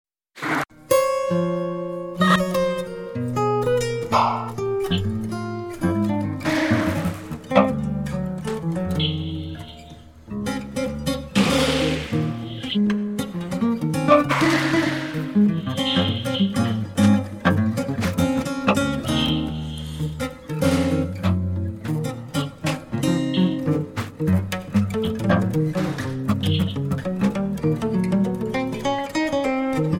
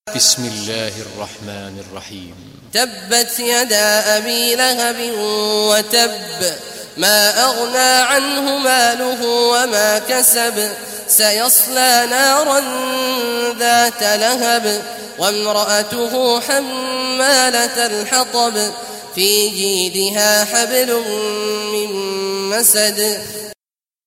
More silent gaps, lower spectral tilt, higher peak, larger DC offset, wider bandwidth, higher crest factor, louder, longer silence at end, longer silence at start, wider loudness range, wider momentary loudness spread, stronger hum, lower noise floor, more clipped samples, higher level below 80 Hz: neither; first, -6 dB/octave vs -0.5 dB/octave; about the same, 0 dBFS vs 0 dBFS; neither; about the same, 17 kHz vs 16.5 kHz; first, 22 dB vs 16 dB; second, -23 LUFS vs -14 LUFS; second, 0 s vs 0.55 s; first, 0.35 s vs 0.05 s; about the same, 4 LU vs 4 LU; second, 9 LU vs 12 LU; neither; second, -42 dBFS vs under -90 dBFS; neither; first, -44 dBFS vs -62 dBFS